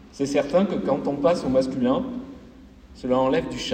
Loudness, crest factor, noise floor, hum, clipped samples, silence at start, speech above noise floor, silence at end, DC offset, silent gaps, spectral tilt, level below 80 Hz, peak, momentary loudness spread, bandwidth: -23 LUFS; 16 dB; -46 dBFS; none; under 0.1%; 0.05 s; 24 dB; 0 s; under 0.1%; none; -6 dB/octave; -50 dBFS; -8 dBFS; 12 LU; 9.4 kHz